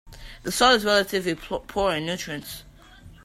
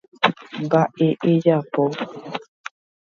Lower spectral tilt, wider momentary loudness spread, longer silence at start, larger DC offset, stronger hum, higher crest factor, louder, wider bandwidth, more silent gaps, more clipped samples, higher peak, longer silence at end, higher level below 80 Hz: second, -3 dB/octave vs -7.5 dB/octave; about the same, 17 LU vs 17 LU; second, 0.05 s vs 0.2 s; neither; neither; about the same, 22 dB vs 22 dB; second, -23 LUFS vs -20 LUFS; first, 16 kHz vs 7.2 kHz; neither; neither; second, -4 dBFS vs 0 dBFS; second, 0.15 s vs 0.75 s; first, -46 dBFS vs -68 dBFS